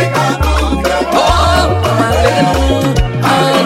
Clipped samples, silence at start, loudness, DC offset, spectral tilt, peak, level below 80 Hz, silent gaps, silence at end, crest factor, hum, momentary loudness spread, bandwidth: under 0.1%; 0 s; -12 LUFS; under 0.1%; -5 dB/octave; 0 dBFS; -18 dBFS; none; 0 s; 10 dB; none; 3 LU; 16.5 kHz